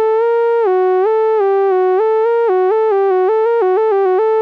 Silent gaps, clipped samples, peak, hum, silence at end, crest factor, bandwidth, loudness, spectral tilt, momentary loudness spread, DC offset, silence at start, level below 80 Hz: none; under 0.1%; -8 dBFS; none; 0 s; 4 dB; 4.9 kHz; -13 LUFS; -5 dB/octave; 0 LU; under 0.1%; 0 s; under -90 dBFS